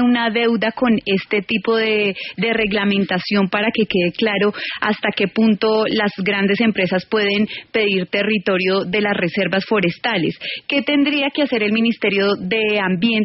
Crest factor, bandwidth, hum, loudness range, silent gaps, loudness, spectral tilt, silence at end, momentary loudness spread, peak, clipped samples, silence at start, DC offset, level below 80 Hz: 14 dB; 5.8 kHz; none; 1 LU; none; -18 LUFS; -3.5 dB/octave; 0 s; 3 LU; -4 dBFS; under 0.1%; 0 s; under 0.1%; -56 dBFS